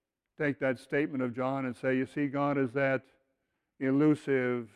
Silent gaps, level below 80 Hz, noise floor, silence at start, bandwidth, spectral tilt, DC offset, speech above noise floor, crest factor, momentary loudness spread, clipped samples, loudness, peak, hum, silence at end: none; -72 dBFS; -81 dBFS; 0.4 s; 11 kHz; -8 dB/octave; under 0.1%; 51 dB; 14 dB; 6 LU; under 0.1%; -31 LUFS; -16 dBFS; none; 0.1 s